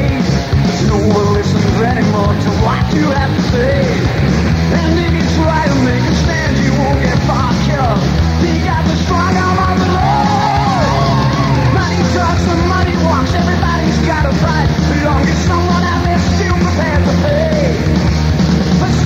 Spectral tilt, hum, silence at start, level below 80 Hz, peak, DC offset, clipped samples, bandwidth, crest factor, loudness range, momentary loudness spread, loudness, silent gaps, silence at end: -6.5 dB/octave; none; 0 s; -22 dBFS; 0 dBFS; under 0.1%; under 0.1%; 13 kHz; 10 dB; 1 LU; 1 LU; -13 LUFS; none; 0 s